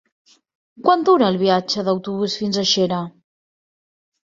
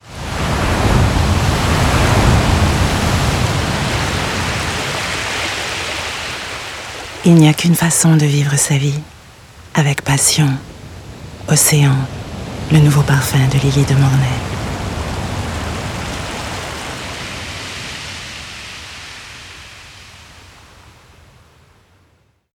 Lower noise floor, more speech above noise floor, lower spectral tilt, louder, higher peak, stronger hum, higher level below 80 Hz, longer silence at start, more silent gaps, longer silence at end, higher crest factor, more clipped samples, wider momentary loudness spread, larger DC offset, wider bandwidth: first, under -90 dBFS vs -56 dBFS; first, over 72 dB vs 44 dB; about the same, -4.5 dB/octave vs -4.5 dB/octave; second, -18 LUFS vs -15 LUFS; about the same, -2 dBFS vs 0 dBFS; neither; second, -62 dBFS vs -28 dBFS; first, 0.8 s vs 0.05 s; neither; second, 1.15 s vs 2.25 s; about the same, 18 dB vs 16 dB; neither; second, 8 LU vs 18 LU; neither; second, 7.6 kHz vs 18 kHz